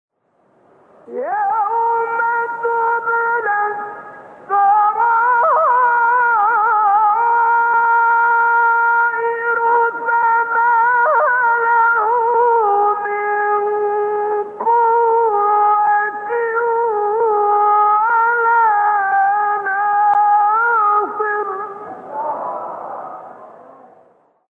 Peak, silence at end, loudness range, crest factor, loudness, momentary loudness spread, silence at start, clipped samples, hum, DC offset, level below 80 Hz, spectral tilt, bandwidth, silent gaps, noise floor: -4 dBFS; 1 s; 5 LU; 10 dB; -15 LUFS; 10 LU; 1.1 s; under 0.1%; none; under 0.1%; -76 dBFS; -5.5 dB/octave; 3.8 kHz; none; -59 dBFS